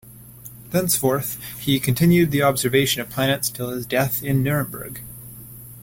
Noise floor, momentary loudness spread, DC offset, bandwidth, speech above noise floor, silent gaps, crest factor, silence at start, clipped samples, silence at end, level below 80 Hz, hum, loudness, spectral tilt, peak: -42 dBFS; 21 LU; under 0.1%; 17 kHz; 21 dB; none; 18 dB; 0.05 s; under 0.1%; 0 s; -50 dBFS; none; -20 LUFS; -4.5 dB/octave; -4 dBFS